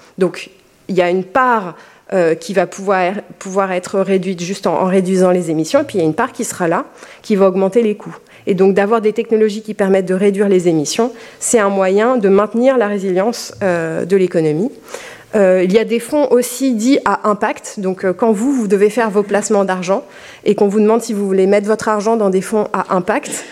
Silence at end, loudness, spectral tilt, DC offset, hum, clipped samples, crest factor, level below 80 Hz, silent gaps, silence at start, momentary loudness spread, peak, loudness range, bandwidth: 0 s; -15 LUFS; -5.5 dB/octave; under 0.1%; none; under 0.1%; 14 dB; -60 dBFS; none; 0.2 s; 8 LU; 0 dBFS; 2 LU; 15 kHz